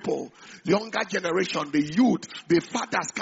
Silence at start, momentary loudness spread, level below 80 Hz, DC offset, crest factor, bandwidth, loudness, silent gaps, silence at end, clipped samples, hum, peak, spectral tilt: 0 s; 9 LU; -66 dBFS; under 0.1%; 16 dB; 8 kHz; -25 LUFS; none; 0 s; under 0.1%; none; -8 dBFS; -4 dB/octave